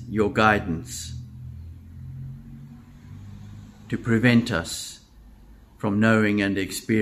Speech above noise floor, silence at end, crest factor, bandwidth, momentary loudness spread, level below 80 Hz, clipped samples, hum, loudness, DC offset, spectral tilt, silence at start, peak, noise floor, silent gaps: 27 dB; 0 s; 22 dB; 15.5 kHz; 24 LU; -50 dBFS; under 0.1%; none; -23 LUFS; under 0.1%; -5.5 dB/octave; 0 s; -2 dBFS; -49 dBFS; none